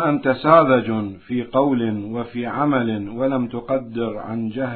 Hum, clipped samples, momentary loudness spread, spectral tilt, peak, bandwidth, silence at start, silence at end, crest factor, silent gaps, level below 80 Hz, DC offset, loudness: none; under 0.1%; 12 LU; -11.5 dB/octave; -2 dBFS; 4.5 kHz; 0 s; 0 s; 18 dB; none; -54 dBFS; under 0.1%; -20 LUFS